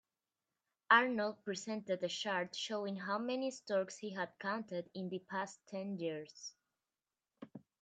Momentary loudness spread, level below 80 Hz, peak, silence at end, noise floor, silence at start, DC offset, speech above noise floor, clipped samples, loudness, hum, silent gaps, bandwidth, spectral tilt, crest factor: 19 LU; -90 dBFS; -14 dBFS; 0.25 s; under -90 dBFS; 0.9 s; under 0.1%; over 51 dB; under 0.1%; -38 LUFS; none; none; 9.4 kHz; -4 dB/octave; 26 dB